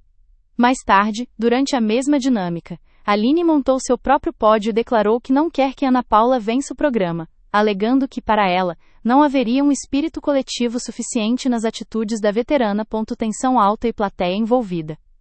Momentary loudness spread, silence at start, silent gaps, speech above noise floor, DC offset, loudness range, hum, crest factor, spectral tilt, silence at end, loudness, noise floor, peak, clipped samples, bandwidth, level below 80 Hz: 8 LU; 0.6 s; none; 36 dB; under 0.1%; 3 LU; none; 18 dB; -5 dB/octave; 0.25 s; -18 LUFS; -53 dBFS; 0 dBFS; under 0.1%; 8.8 kHz; -46 dBFS